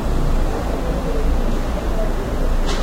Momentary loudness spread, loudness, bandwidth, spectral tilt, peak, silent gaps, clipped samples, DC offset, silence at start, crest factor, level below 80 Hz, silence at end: 2 LU; -23 LUFS; 15 kHz; -6 dB/octave; -6 dBFS; none; under 0.1%; under 0.1%; 0 s; 10 dB; -18 dBFS; 0 s